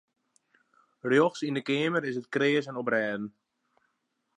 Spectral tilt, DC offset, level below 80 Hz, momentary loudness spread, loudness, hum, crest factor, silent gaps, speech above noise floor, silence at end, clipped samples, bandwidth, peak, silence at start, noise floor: -5.5 dB/octave; under 0.1%; -82 dBFS; 11 LU; -28 LUFS; none; 20 dB; none; 51 dB; 1.1 s; under 0.1%; 10 kHz; -10 dBFS; 1.05 s; -78 dBFS